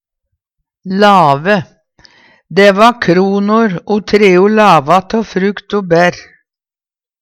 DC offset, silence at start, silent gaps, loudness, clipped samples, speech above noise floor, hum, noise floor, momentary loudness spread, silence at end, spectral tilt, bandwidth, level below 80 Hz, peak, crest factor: under 0.1%; 0.85 s; none; -10 LUFS; 0.2%; over 81 dB; none; under -90 dBFS; 9 LU; 1 s; -6 dB/octave; 14 kHz; -48 dBFS; 0 dBFS; 12 dB